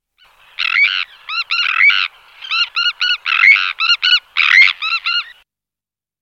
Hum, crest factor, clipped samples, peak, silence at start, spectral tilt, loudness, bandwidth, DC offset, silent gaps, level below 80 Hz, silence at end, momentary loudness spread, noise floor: none; 16 dB; under 0.1%; 0 dBFS; 0.6 s; 5 dB/octave; -12 LUFS; 11.5 kHz; under 0.1%; none; -66 dBFS; 0.9 s; 12 LU; -90 dBFS